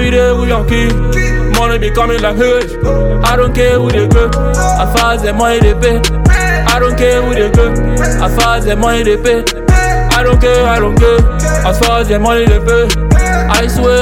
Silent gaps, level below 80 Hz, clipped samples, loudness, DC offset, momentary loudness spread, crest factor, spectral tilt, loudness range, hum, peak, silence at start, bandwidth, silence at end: none; -14 dBFS; 0.3%; -10 LUFS; under 0.1%; 3 LU; 10 dB; -5 dB/octave; 2 LU; none; 0 dBFS; 0 s; 16.5 kHz; 0 s